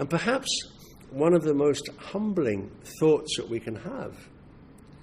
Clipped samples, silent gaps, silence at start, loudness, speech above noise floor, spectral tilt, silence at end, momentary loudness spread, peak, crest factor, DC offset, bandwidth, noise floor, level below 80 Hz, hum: under 0.1%; none; 0 s; -27 LUFS; 24 dB; -5 dB/octave; 0.4 s; 16 LU; -10 dBFS; 18 dB; under 0.1%; 15 kHz; -50 dBFS; -58 dBFS; none